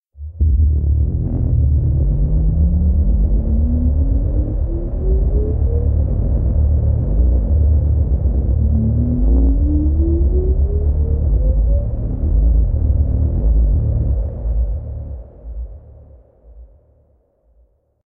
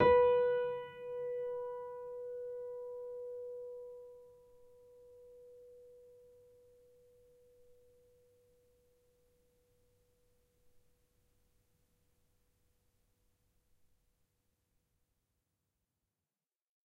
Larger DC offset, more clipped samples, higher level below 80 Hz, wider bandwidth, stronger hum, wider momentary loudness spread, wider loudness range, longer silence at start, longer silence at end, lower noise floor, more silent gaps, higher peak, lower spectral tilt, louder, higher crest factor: neither; neither; first, -16 dBFS vs -72 dBFS; second, 1.3 kHz vs 4.2 kHz; neither; second, 6 LU vs 28 LU; second, 6 LU vs 24 LU; first, 0.2 s vs 0 s; second, 1.45 s vs 10.85 s; second, -57 dBFS vs under -90 dBFS; neither; first, -4 dBFS vs -16 dBFS; first, -15.5 dB/octave vs -7 dB/octave; first, -17 LUFS vs -37 LUFS; second, 10 dB vs 26 dB